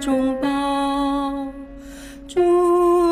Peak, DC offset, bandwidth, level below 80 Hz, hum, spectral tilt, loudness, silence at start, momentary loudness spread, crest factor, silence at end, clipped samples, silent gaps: -8 dBFS; under 0.1%; 14.5 kHz; -44 dBFS; none; -5 dB/octave; -20 LUFS; 0 s; 22 LU; 12 dB; 0 s; under 0.1%; none